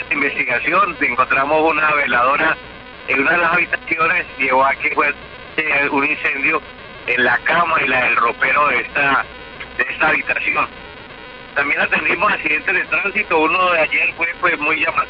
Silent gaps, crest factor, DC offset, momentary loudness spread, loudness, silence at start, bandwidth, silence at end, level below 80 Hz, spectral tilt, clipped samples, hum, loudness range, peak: none; 12 dB; under 0.1%; 10 LU; -16 LUFS; 0 s; 6 kHz; 0 s; -48 dBFS; -7 dB/octave; under 0.1%; none; 2 LU; -4 dBFS